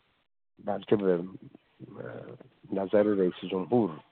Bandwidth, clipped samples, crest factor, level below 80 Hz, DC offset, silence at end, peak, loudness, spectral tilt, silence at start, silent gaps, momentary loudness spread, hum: 4.3 kHz; under 0.1%; 20 dB; -70 dBFS; under 0.1%; 0.1 s; -10 dBFS; -28 LUFS; -6.5 dB/octave; 0.65 s; none; 19 LU; none